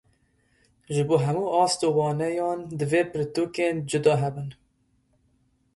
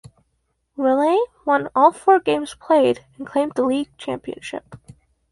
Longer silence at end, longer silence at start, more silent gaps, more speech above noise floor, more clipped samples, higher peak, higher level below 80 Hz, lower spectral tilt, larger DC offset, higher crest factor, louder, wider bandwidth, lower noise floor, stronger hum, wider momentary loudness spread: first, 1.2 s vs 0.55 s; about the same, 0.9 s vs 0.8 s; neither; second, 43 dB vs 51 dB; neither; second, -8 dBFS vs -2 dBFS; about the same, -62 dBFS vs -60 dBFS; about the same, -5.5 dB/octave vs -5 dB/octave; neither; about the same, 18 dB vs 18 dB; second, -25 LUFS vs -19 LUFS; about the same, 11.5 kHz vs 11.5 kHz; about the same, -68 dBFS vs -70 dBFS; neither; second, 8 LU vs 15 LU